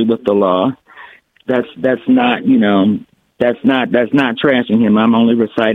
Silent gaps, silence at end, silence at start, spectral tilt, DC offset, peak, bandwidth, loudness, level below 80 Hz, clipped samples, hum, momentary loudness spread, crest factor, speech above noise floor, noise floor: none; 0 s; 0 s; -8 dB/octave; under 0.1%; 0 dBFS; 4.3 kHz; -13 LUFS; -56 dBFS; under 0.1%; none; 7 LU; 14 dB; 27 dB; -40 dBFS